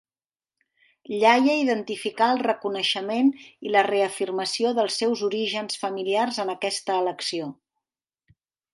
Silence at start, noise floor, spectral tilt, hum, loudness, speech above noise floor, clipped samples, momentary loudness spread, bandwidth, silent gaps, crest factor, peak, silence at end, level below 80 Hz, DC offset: 1.1 s; under -90 dBFS; -3 dB/octave; none; -24 LUFS; over 66 dB; under 0.1%; 9 LU; 11.5 kHz; none; 20 dB; -4 dBFS; 1.2 s; -78 dBFS; under 0.1%